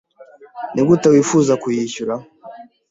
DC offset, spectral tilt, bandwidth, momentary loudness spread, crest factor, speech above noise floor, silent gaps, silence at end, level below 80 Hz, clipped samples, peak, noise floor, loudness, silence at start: under 0.1%; -6 dB/octave; 8 kHz; 14 LU; 16 dB; 29 dB; none; 0.25 s; -58 dBFS; under 0.1%; -2 dBFS; -44 dBFS; -16 LUFS; 0.2 s